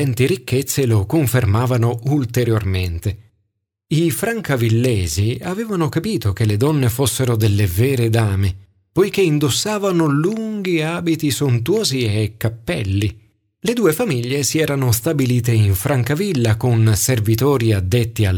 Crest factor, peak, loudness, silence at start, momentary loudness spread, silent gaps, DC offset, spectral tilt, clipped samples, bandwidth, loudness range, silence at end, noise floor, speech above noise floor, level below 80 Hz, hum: 14 dB; -2 dBFS; -18 LUFS; 0 s; 6 LU; none; under 0.1%; -5.5 dB/octave; under 0.1%; 19 kHz; 3 LU; 0 s; -71 dBFS; 55 dB; -42 dBFS; none